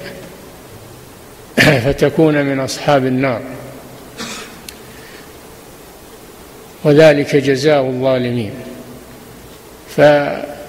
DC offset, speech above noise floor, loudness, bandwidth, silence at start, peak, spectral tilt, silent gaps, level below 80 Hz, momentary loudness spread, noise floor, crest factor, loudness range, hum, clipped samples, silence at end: under 0.1%; 25 dB; -13 LUFS; 16 kHz; 0 s; 0 dBFS; -5.5 dB/octave; none; -44 dBFS; 26 LU; -37 dBFS; 16 dB; 11 LU; none; under 0.1%; 0 s